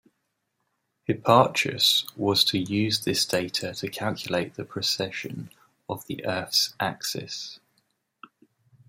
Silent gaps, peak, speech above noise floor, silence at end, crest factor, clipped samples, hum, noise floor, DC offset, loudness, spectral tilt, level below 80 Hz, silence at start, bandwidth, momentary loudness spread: none; -4 dBFS; 51 dB; 1.3 s; 24 dB; under 0.1%; none; -77 dBFS; under 0.1%; -25 LUFS; -3.5 dB/octave; -68 dBFS; 1.1 s; 16 kHz; 16 LU